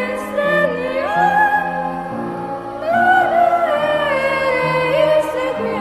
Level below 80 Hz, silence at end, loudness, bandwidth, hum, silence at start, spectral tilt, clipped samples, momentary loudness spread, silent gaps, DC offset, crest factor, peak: -50 dBFS; 0 s; -17 LUFS; 14 kHz; none; 0 s; -5.5 dB/octave; under 0.1%; 11 LU; none; under 0.1%; 16 dB; -2 dBFS